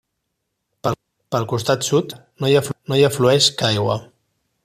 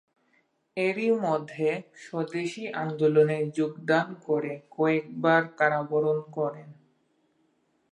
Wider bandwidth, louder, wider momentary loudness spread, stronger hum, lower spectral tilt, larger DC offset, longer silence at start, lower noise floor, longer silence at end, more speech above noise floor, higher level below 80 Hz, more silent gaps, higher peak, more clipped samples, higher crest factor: first, 15 kHz vs 9.8 kHz; first, -19 LUFS vs -27 LUFS; about the same, 11 LU vs 10 LU; neither; second, -4.5 dB/octave vs -7 dB/octave; neither; about the same, 0.85 s vs 0.75 s; first, -76 dBFS vs -70 dBFS; second, 0.6 s vs 1.2 s; first, 58 dB vs 44 dB; first, -56 dBFS vs -80 dBFS; neither; first, -2 dBFS vs -8 dBFS; neither; about the same, 18 dB vs 20 dB